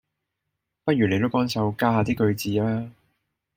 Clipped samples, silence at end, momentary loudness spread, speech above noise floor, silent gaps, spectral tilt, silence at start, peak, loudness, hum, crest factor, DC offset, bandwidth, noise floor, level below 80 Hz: under 0.1%; 0.65 s; 8 LU; 59 dB; none; -6.5 dB/octave; 0.85 s; -6 dBFS; -24 LUFS; none; 20 dB; under 0.1%; 16.5 kHz; -81 dBFS; -56 dBFS